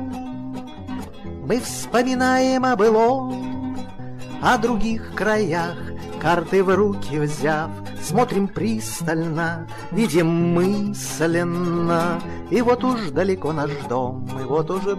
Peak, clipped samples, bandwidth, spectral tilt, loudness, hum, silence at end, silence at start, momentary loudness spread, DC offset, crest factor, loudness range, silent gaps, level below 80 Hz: -8 dBFS; under 0.1%; 15.5 kHz; -5.5 dB/octave; -21 LUFS; none; 0 s; 0 s; 14 LU; under 0.1%; 14 dB; 2 LU; none; -44 dBFS